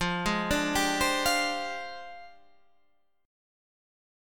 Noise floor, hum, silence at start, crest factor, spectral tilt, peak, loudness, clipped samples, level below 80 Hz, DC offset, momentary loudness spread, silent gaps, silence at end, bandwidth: -71 dBFS; none; 0 s; 18 dB; -3 dB/octave; -14 dBFS; -27 LUFS; under 0.1%; -48 dBFS; 0.3%; 18 LU; none; 1 s; 19 kHz